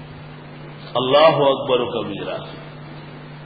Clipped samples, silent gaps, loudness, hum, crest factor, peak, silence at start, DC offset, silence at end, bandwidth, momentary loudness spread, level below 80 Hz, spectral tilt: under 0.1%; none; -18 LUFS; none; 18 dB; -2 dBFS; 0 s; under 0.1%; 0 s; 5 kHz; 24 LU; -54 dBFS; -10 dB/octave